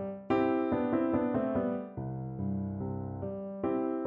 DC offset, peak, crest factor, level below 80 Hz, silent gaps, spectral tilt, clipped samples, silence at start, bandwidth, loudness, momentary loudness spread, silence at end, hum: under 0.1%; -18 dBFS; 16 dB; -58 dBFS; none; -8 dB/octave; under 0.1%; 0 s; 5.2 kHz; -33 LUFS; 9 LU; 0 s; none